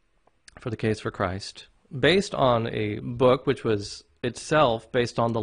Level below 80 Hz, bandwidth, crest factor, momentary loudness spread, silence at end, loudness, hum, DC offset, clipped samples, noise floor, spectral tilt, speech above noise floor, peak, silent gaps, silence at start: -52 dBFS; 10.5 kHz; 18 dB; 14 LU; 0 s; -25 LUFS; none; under 0.1%; under 0.1%; -58 dBFS; -5.5 dB/octave; 33 dB; -8 dBFS; none; 0.6 s